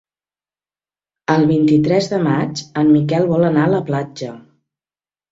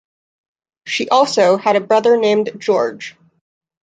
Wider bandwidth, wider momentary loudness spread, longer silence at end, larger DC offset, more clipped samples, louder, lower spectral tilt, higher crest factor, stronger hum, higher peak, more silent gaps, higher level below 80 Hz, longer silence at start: second, 8 kHz vs 9.4 kHz; first, 13 LU vs 10 LU; first, 0.9 s vs 0.75 s; neither; neither; about the same, -16 LUFS vs -15 LUFS; first, -7.5 dB/octave vs -4 dB/octave; about the same, 16 dB vs 16 dB; first, 50 Hz at -40 dBFS vs none; about the same, -2 dBFS vs -2 dBFS; neither; first, -54 dBFS vs -68 dBFS; first, 1.3 s vs 0.85 s